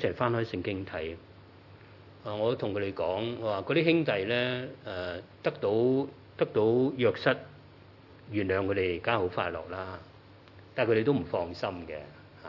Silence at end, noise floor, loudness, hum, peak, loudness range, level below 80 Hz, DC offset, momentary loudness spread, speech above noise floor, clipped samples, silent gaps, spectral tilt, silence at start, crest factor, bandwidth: 0 s; -53 dBFS; -30 LUFS; none; -8 dBFS; 4 LU; -66 dBFS; under 0.1%; 14 LU; 24 dB; under 0.1%; none; -8 dB/octave; 0 s; 22 dB; 6 kHz